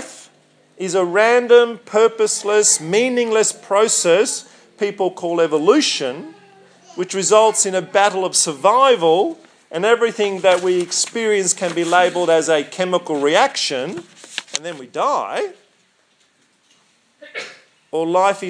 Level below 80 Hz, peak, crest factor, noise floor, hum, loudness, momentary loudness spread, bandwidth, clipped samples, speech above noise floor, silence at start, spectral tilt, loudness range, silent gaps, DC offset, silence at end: -80 dBFS; 0 dBFS; 18 dB; -59 dBFS; none; -16 LUFS; 15 LU; 10.5 kHz; under 0.1%; 43 dB; 0 s; -2.5 dB/octave; 10 LU; none; under 0.1%; 0 s